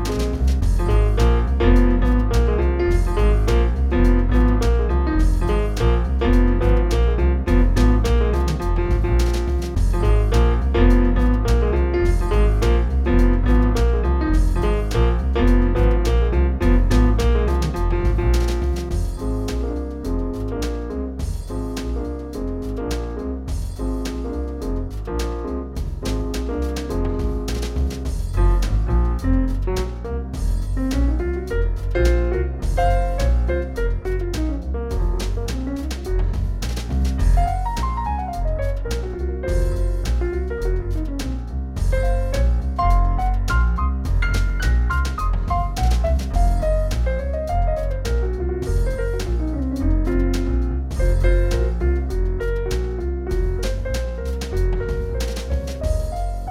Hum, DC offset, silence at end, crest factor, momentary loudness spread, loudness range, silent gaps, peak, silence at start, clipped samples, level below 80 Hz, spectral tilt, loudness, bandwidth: none; under 0.1%; 0 s; 14 dB; 9 LU; 7 LU; none; -4 dBFS; 0 s; under 0.1%; -20 dBFS; -7 dB/octave; -22 LUFS; 12.5 kHz